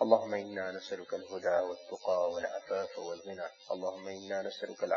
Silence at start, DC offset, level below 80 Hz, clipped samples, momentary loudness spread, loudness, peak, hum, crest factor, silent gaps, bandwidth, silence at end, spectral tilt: 0 s; under 0.1%; -82 dBFS; under 0.1%; 10 LU; -36 LUFS; -10 dBFS; none; 24 dB; none; 7.2 kHz; 0 s; -2.5 dB/octave